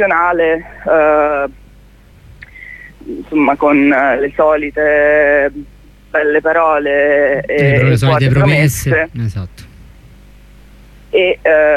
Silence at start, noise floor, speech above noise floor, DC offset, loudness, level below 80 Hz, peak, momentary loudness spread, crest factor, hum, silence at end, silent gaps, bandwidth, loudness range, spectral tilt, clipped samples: 0 s; -42 dBFS; 30 dB; under 0.1%; -12 LUFS; -38 dBFS; 0 dBFS; 16 LU; 12 dB; 50 Hz at -40 dBFS; 0 s; none; 15 kHz; 4 LU; -6.5 dB/octave; under 0.1%